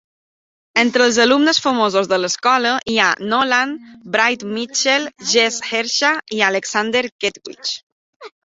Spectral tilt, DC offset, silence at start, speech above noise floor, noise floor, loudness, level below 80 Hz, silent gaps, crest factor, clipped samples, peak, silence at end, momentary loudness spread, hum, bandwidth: -2 dB/octave; under 0.1%; 0.75 s; over 73 dB; under -90 dBFS; -16 LUFS; -62 dBFS; 7.12-7.19 s, 7.83-8.20 s; 18 dB; under 0.1%; 0 dBFS; 0.2 s; 10 LU; none; 8 kHz